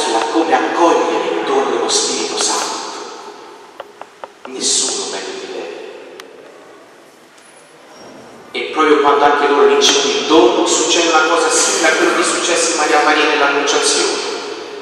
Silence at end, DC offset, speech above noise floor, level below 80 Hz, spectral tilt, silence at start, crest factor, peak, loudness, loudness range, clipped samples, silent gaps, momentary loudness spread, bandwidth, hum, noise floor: 0 s; under 0.1%; 30 dB; -62 dBFS; -0.5 dB/octave; 0 s; 16 dB; 0 dBFS; -13 LUFS; 11 LU; under 0.1%; none; 19 LU; 14 kHz; none; -43 dBFS